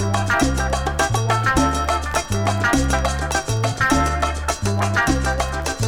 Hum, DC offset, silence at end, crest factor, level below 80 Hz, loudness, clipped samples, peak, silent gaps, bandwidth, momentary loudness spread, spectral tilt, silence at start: none; under 0.1%; 0 s; 16 dB; -28 dBFS; -20 LUFS; under 0.1%; -4 dBFS; none; 18 kHz; 4 LU; -4.5 dB/octave; 0 s